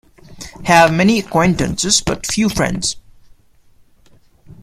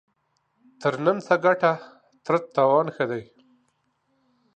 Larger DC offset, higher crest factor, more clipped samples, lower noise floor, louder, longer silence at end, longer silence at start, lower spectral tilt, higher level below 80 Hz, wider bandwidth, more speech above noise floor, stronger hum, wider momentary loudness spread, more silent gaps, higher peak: neither; about the same, 18 dB vs 20 dB; neither; second, -49 dBFS vs -72 dBFS; first, -15 LUFS vs -23 LUFS; second, 0.1 s vs 1.35 s; second, 0.3 s vs 0.8 s; second, -4 dB/octave vs -6.5 dB/octave; first, -38 dBFS vs -76 dBFS; first, 15.5 kHz vs 8.6 kHz; second, 35 dB vs 49 dB; neither; first, 16 LU vs 11 LU; neither; first, 0 dBFS vs -6 dBFS